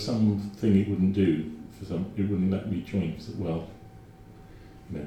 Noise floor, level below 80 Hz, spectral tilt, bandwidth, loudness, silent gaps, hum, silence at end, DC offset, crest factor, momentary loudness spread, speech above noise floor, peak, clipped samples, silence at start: -49 dBFS; -54 dBFS; -8.5 dB/octave; 9.2 kHz; -28 LUFS; none; none; 0 s; under 0.1%; 18 dB; 15 LU; 22 dB; -10 dBFS; under 0.1%; 0 s